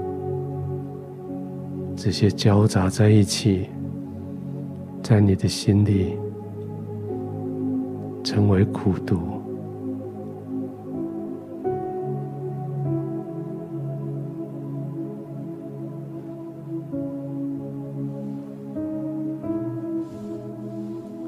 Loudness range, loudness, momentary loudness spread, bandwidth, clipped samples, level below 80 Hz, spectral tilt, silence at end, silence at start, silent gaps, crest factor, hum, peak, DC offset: 11 LU; -26 LUFS; 15 LU; 13.5 kHz; under 0.1%; -56 dBFS; -7 dB/octave; 0 s; 0 s; none; 20 dB; none; -4 dBFS; under 0.1%